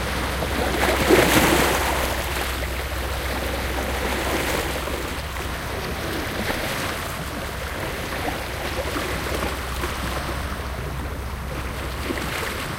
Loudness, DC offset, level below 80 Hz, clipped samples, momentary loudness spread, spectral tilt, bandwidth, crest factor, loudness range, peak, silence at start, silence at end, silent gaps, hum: -24 LUFS; under 0.1%; -32 dBFS; under 0.1%; 11 LU; -4 dB/octave; 17 kHz; 22 dB; 7 LU; -4 dBFS; 0 s; 0 s; none; none